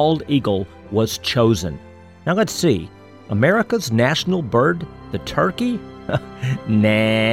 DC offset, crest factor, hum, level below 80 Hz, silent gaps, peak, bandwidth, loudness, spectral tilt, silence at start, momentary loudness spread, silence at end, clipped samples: 0.1%; 16 dB; none; -46 dBFS; none; -2 dBFS; 16.5 kHz; -19 LUFS; -5.5 dB/octave; 0 s; 11 LU; 0 s; under 0.1%